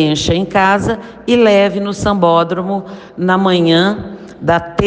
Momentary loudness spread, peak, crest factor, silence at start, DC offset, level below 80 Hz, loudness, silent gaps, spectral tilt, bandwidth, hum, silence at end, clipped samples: 11 LU; 0 dBFS; 14 dB; 0 s; under 0.1%; -38 dBFS; -13 LUFS; none; -5.5 dB/octave; 9.6 kHz; none; 0 s; under 0.1%